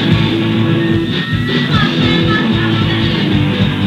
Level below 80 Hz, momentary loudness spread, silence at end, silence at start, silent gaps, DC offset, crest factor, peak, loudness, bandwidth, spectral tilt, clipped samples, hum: -32 dBFS; 3 LU; 0 s; 0 s; none; under 0.1%; 12 dB; 0 dBFS; -13 LUFS; 11 kHz; -7 dB/octave; under 0.1%; none